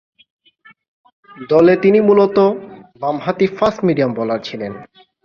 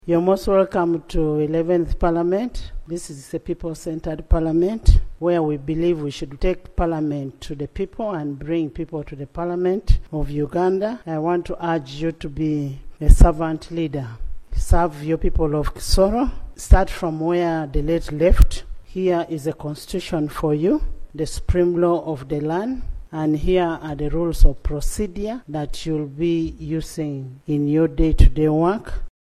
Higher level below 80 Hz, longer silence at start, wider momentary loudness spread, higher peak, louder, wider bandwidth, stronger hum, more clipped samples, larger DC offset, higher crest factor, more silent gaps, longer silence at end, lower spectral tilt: second, -56 dBFS vs -22 dBFS; first, 1.35 s vs 0.05 s; first, 17 LU vs 12 LU; about the same, -2 dBFS vs 0 dBFS; first, -15 LUFS vs -22 LUFS; second, 6.8 kHz vs 13.5 kHz; neither; neither; neither; second, 14 dB vs 20 dB; neither; first, 0.4 s vs 0.15 s; about the same, -8 dB/octave vs -7 dB/octave